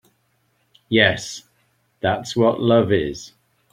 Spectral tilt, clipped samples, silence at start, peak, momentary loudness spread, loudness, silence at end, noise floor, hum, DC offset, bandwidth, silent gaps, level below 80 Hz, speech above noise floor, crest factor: -5 dB/octave; under 0.1%; 0.9 s; -2 dBFS; 16 LU; -19 LUFS; 0.45 s; -66 dBFS; none; under 0.1%; 14.5 kHz; none; -52 dBFS; 47 dB; 20 dB